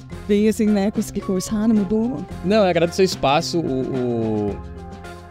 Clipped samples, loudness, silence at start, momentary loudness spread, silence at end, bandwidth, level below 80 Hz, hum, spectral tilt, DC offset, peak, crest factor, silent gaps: under 0.1%; -20 LUFS; 0 s; 10 LU; 0 s; 15.5 kHz; -42 dBFS; none; -6 dB/octave; under 0.1%; -6 dBFS; 14 dB; none